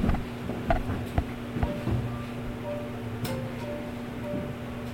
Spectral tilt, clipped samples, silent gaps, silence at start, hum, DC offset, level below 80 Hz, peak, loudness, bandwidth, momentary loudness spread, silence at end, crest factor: -7 dB/octave; under 0.1%; none; 0 s; none; under 0.1%; -38 dBFS; -10 dBFS; -33 LUFS; 16.5 kHz; 6 LU; 0 s; 20 dB